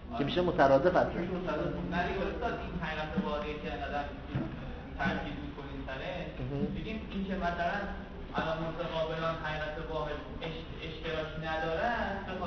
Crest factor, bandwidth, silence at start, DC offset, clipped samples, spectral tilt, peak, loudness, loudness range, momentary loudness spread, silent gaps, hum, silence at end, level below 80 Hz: 22 dB; 6.6 kHz; 0 s; under 0.1%; under 0.1%; -4.5 dB/octave; -12 dBFS; -34 LUFS; 6 LU; 10 LU; none; none; 0 s; -46 dBFS